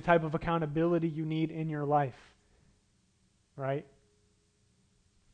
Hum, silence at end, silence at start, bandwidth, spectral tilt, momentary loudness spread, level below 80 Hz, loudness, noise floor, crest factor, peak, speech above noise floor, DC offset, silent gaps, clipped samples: none; 1.5 s; 0 s; 8.4 kHz; -8.5 dB/octave; 9 LU; -58 dBFS; -32 LUFS; -71 dBFS; 22 dB; -10 dBFS; 40 dB; under 0.1%; none; under 0.1%